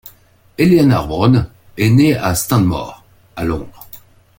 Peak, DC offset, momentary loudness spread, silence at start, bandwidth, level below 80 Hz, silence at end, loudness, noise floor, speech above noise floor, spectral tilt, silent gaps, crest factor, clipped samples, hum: 0 dBFS; under 0.1%; 19 LU; 0.6 s; 17 kHz; -38 dBFS; 0.4 s; -14 LUFS; -47 dBFS; 34 dB; -6.5 dB/octave; none; 14 dB; under 0.1%; none